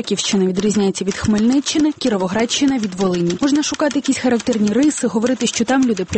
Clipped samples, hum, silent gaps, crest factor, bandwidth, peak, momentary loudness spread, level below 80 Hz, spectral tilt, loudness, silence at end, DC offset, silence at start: under 0.1%; none; none; 12 dB; 8.8 kHz; -6 dBFS; 3 LU; -48 dBFS; -4.5 dB/octave; -17 LUFS; 0 s; under 0.1%; 0 s